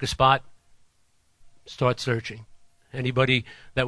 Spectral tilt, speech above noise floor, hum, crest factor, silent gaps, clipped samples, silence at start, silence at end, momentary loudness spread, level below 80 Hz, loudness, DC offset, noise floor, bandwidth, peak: -5 dB/octave; 42 dB; none; 22 dB; none; under 0.1%; 0 s; 0 s; 18 LU; -48 dBFS; -24 LUFS; under 0.1%; -67 dBFS; 11 kHz; -4 dBFS